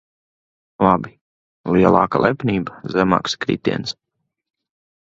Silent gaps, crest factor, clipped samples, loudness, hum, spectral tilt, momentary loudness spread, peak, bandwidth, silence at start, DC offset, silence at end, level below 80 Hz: 1.21-1.64 s; 20 dB; under 0.1%; -18 LUFS; none; -6.5 dB/octave; 14 LU; 0 dBFS; 7.8 kHz; 0.8 s; under 0.1%; 1.15 s; -48 dBFS